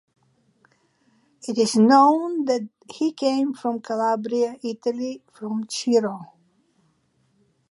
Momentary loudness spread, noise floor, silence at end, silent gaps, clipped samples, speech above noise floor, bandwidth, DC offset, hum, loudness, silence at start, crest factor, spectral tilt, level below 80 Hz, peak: 15 LU; -66 dBFS; 1.45 s; none; under 0.1%; 44 dB; 11.5 kHz; under 0.1%; none; -22 LUFS; 1.45 s; 20 dB; -5 dB/octave; -76 dBFS; -2 dBFS